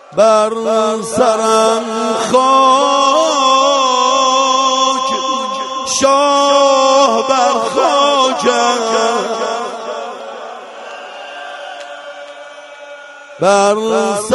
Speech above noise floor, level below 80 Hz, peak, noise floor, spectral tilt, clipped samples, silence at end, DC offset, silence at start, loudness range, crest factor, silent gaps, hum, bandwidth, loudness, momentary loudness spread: 22 dB; -60 dBFS; 0 dBFS; -33 dBFS; -2 dB/octave; under 0.1%; 0 s; under 0.1%; 0.1 s; 13 LU; 14 dB; none; none; 11.5 kHz; -12 LUFS; 19 LU